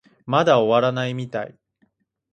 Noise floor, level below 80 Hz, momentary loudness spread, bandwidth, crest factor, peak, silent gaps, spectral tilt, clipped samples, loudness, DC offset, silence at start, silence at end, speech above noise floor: -66 dBFS; -66 dBFS; 14 LU; 8.4 kHz; 18 dB; -4 dBFS; none; -6.5 dB/octave; under 0.1%; -20 LUFS; under 0.1%; 0.25 s; 0.85 s; 47 dB